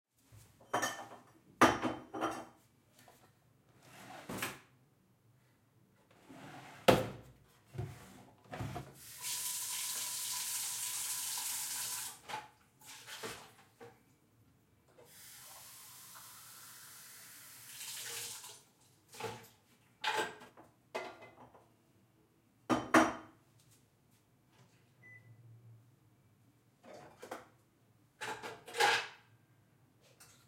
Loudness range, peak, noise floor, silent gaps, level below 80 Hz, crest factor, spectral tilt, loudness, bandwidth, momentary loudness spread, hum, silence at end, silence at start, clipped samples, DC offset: 15 LU; -10 dBFS; -70 dBFS; none; -70 dBFS; 32 dB; -2.5 dB/octave; -37 LUFS; 16.5 kHz; 27 LU; none; 0.2 s; 0.3 s; under 0.1%; under 0.1%